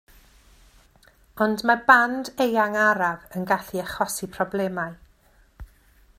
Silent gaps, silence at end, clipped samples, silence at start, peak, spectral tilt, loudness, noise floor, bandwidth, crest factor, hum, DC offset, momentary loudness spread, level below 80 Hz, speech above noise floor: none; 0.55 s; under 0.1%; 1.35 s; 0 dBFS; -4 dB/octave; -22 LUFS; -58 dBFS; 16 kHz; 24 dB; none; under 0.1%; 12 LU; -54 dBFS; 35 dB